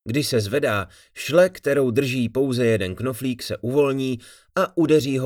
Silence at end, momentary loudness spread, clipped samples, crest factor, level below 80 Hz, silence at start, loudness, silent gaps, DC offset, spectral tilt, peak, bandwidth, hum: 0 s; 9 LU; under 0.1%; 16 dB; -58 dBFS; 0.05 s; -22 LUFS; none; under 0.1%; -5.5 dB/octave; -4 dBFS; 18.5 kHz; none